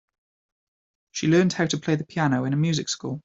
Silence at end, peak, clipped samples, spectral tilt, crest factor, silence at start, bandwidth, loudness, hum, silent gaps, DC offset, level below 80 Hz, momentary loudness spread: 0.05 s; -8 dBFS; under 0.1%; -5.5 dB/octave; 18 dB; 1.15 s; 8 kHz; -23 LUFS; none; none; under 0.1%; -62 dBFS; 8 LU